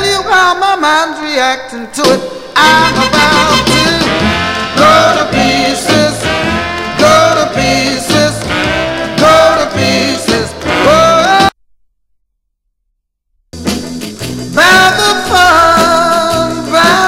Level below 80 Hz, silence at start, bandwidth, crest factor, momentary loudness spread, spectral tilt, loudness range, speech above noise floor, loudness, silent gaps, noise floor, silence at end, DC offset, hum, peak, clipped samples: -34 dBFS; 0 s; 16.5 kHz; 10 dB; 9 LU; -3.5 dB/octave; 4 LU; 57 dB; -9 LUFS; none; -67 dBFS; 0 s; under 0.1%; 50 Hz at -45 dBFS; 0 dBFS; 0.8%